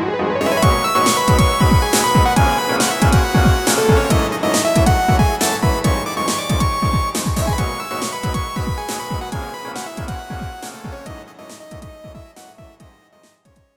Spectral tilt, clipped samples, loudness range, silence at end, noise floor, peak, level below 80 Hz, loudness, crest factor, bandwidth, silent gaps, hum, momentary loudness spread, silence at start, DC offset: -4.5 dB/octave; under 0.1%; 17 LU; 1.1 s; -55 dBFS; -2 dBFS; -28 dBFS; -17 LUFS; 16 dB; over 20 kHz; none; none; 18 LU; 0 s; under 0.1%